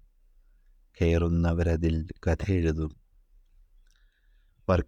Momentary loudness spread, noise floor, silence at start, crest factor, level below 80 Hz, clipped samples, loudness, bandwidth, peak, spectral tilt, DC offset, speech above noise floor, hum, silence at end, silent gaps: 8 LU; -63 dBFS; 1 s; 16 dB; -42 dBFS; under 0.1%; -28 LUFS; 7.4 kHz; -12 dBFS; -8 dB/octave; under 0.1%; 37 dB; none; 0.05 s; none